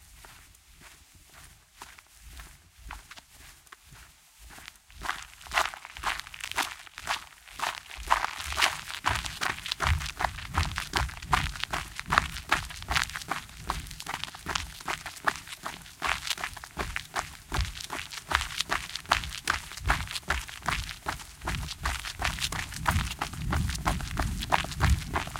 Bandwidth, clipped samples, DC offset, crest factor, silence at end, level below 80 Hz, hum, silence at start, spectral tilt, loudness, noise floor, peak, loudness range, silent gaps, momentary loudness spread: 17 kHz; under 0.1%; under 0.1%; 30 dB; 0 s; -40 dBFS; none; 0 s; -3 dB/octave; -31 LUFS; -54 dBFS; -2 dBFS; 14 LU; none; 20 LU